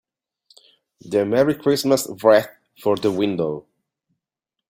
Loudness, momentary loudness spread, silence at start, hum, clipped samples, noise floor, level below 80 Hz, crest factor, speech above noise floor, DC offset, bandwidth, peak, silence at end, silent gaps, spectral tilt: -20 LUFS; 10 LU; 1.05 s; none; under 0.1%; -85 dBFS; -62 dBFS; 20 dB; 66 dB; under 0.1%; 16.5 kHz; -2 dBFS; 1.1 s; none; -5 dB/octave